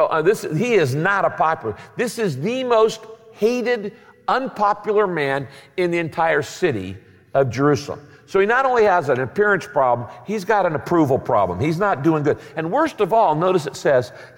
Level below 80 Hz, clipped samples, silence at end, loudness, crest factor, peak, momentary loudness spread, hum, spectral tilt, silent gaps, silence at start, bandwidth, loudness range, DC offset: -58 dBFS; under 0.1%; 0.1 s; -19 LUFS; 14 dB; -6 dBFS; 9 LU; none; -6 dB/octave; none; 0 s; 17 kHz; 3 LU; under 0.1%